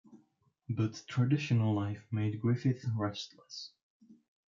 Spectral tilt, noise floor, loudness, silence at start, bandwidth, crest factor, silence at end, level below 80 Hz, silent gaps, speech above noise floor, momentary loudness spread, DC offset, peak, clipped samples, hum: -7 dB/octave; -71 dBFS; -33 LUFS; 0.1 s; 7.4 kHz; 16 dB; 0.35 s; -76 dBFS; 3.83-4.00 s; 39 dB; 15 LU; under 0.1%; -18 dBFS; under 0.1%; none